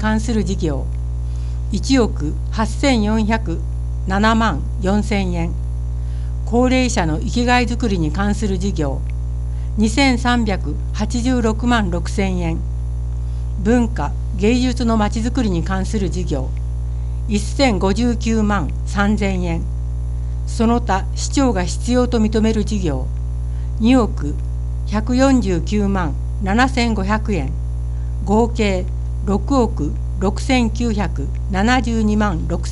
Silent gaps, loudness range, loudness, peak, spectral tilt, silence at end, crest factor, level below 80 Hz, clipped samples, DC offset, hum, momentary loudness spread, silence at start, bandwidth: none; 1 LU; -19 LUFS; 0 dBFS; -6 dB/octave; 0 s; 16 dB; -22 dBFS; under 0.1%; under 0.1%; 60 Hz at -20 dBFS; 9 LU; 0 s; 11.5 kHz